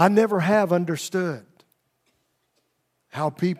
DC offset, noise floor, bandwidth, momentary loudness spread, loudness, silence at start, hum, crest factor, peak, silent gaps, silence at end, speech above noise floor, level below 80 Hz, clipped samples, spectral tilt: under 0.1%; -73 dBFS; 15.5 kHz; 13 LU; -23 LUFS; 0 s; none; 22 dB; -2 dBFS; none; 0.05 s; 51 dB; -74 dBFS; under 0.1%; -6 dB/octave